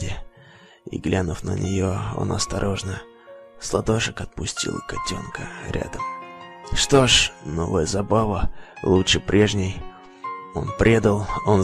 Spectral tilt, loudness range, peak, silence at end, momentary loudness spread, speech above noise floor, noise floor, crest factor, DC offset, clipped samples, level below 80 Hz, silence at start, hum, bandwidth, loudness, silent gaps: -4.5 dB/octave; 7 LU; -4 dBFS; 0 s; 17 LU; 27 dB; -49 dBFS; 20 dB; under 0.1%; under 0.1%; -36 dBFS; 0 s; none; 13 kHz; -22 LUFS; none